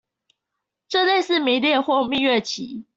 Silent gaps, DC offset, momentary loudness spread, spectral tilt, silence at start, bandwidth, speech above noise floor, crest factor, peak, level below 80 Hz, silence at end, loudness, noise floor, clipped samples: none; under 0.1%; 7 LU; -3 dB/octave; 0.9 s; 8 kHz; 62 dB; 14 dB; -8 dBFS; -64 dBFS; 0.15 s; -20 LUFS; -82 dBFS; under 0.1%